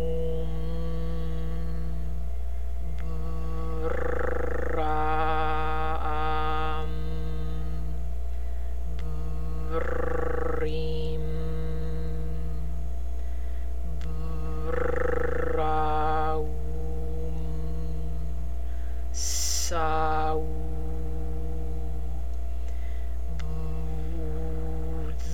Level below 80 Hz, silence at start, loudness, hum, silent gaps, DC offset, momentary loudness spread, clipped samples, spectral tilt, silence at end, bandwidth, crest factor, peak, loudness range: -32 dBFS; 0 s; -31 LUFS; none; none; 5%; 9 LU; under 0.1%; -5 dB/octave; 0 s; 16.5 kHz; 16 dB; -14 dBFS; 5 LU